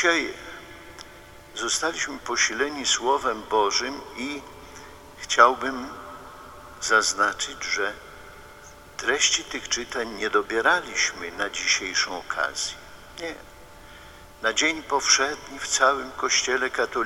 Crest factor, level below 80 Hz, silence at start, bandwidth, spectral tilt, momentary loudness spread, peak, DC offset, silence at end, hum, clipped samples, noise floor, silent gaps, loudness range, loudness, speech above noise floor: 24 dB; -54 dBFS; 0 s; 17 kHz; -0.5 dB/octave; 22 LU; -2 dBFS; under 0.1%; 0 s; none; under 0.1%; -46 dBFS; none; 3 LU; -23 LUFS; 21 dB